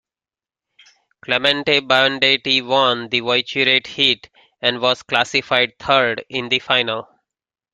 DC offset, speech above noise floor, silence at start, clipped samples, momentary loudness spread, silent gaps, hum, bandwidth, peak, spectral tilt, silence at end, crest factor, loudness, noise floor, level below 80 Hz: under 0.1%; over 72 dB; 1.3 s; under 0.1%; 7 LU; none; none; 13 kHz; 0 dBFS; -3.5 dB/octave; 0.7 s; 20 dB; -17 LUFS; under -90 dBFS; -60 dBFS